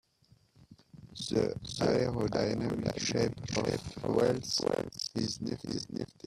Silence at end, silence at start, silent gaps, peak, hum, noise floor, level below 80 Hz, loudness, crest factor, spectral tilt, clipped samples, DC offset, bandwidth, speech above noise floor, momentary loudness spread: 0.2 s; 0.6 s; none; -14 dBFS; none; -66 dBFS; -58 dBFS; -33 LUFS; 18 dB; -5 dB/octave; under 0.1%; under 0.1%; 14 kHz; 34 dB; 8 LU